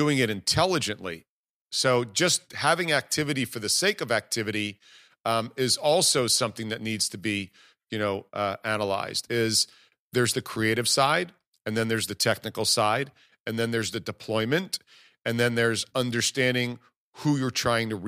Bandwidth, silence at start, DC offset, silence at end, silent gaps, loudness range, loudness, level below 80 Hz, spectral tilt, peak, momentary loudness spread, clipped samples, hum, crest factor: 15.5 kHz; 0 s; under 0.1%; 0 s; 1.28-1.66 s, 5.20-5.24 s, 9.99-10.10 s, 11.47-11.52 s, 13.40-13.45 s, 16.96-17.13 s; 3 LU; -26 LUFS; -62 dBFS; -3 dB/octave; -6 dBFS; 10 LU; under 0.1%; none; 20 dB